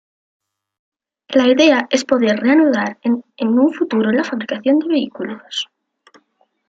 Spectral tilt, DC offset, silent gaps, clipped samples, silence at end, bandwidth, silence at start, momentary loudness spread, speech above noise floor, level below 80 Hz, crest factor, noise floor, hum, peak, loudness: -4.5 dB/octave; under 0.1%; none; under 0.1%; 1.05 s; 7.8 kHz; 1.3 s; 12 LU; 46 dB; -64 dBFS; 16 dB; -62 dBFS; none; 0 dBFS; -16 LUFS